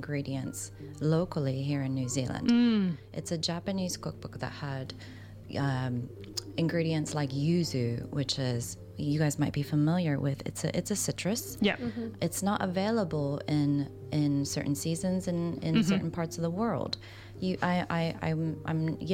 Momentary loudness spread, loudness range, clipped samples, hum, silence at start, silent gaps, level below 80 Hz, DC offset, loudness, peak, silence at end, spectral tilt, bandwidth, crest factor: 10 LU; 4 LU; under 0.1%; none; 0 s; none; -56 dBFS; under 0.1%; -31 LUFS; -12 dBFS; 0 s; -5.5 dB/octave; 16 kHz; 18 dB